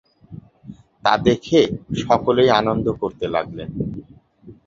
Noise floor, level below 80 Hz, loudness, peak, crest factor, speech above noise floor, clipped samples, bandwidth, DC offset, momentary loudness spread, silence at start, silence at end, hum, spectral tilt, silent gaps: -46 dBFS; -46 dBFS; -19 LUFS; 0 dBFS; 20 dB; 27 dB; under 0.1%; 7.6 kHz; under 0.1%; 13 LU; 0.3 s; 0.15 s; none; -6 dB/octave; none